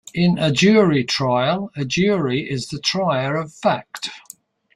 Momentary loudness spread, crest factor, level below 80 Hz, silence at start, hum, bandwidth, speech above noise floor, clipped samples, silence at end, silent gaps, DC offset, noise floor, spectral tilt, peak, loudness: 12 LU; 18 dB; -54 dBFS; 0.15 s; none; 14.5 kHz; 28 dB; under 0.1%; 0.55 s; none; under 0.1%; -46 dBFS; -5.5 dB/octave; -2 dBFS; -19 LUFS